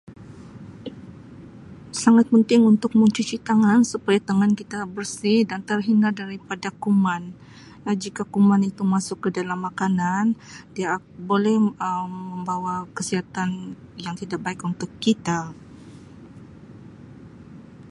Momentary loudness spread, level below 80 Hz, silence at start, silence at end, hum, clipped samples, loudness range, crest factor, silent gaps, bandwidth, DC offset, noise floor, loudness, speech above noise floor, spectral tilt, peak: 21 LU; -60 dBFS; 0.1 s; 0.1 s; none; under 0.1%; 10 LU; 18 dB; none; 11.5 kHz; under 0.1%; -43 dBFS; -22 LUFS; 22 dB; -6 dB/octave; -4 dBFS